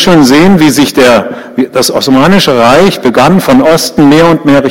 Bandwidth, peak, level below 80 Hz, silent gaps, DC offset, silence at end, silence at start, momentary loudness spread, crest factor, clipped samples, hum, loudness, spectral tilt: 17 kHz; 0 dBFS; -34 dBFS; none; under 0.1%; 0 s; 0 s; 5 LU; 4 dB; 5%; none; -5 LUFS; -5 dB/octave